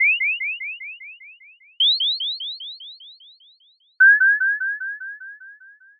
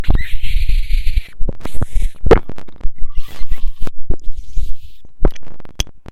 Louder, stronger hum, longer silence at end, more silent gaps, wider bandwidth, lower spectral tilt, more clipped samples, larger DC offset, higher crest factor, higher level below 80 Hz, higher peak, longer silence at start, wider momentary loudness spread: first, -18 LUFS vs -23 LUFS; neither; first, 0.45 s vs 0 s; neither; second, 4.7 kHz vs 7 kHz; second, 7 dB/octave vs -6 dB/octave; neither; neither; first, 16 dB vs 10 dB; second, under -90 dBFS vs -18 dBFS; second, -6 dBFS vs 0 dBFS; about the same, 0 s vs 0 s; first, 24 LU vs 18 LU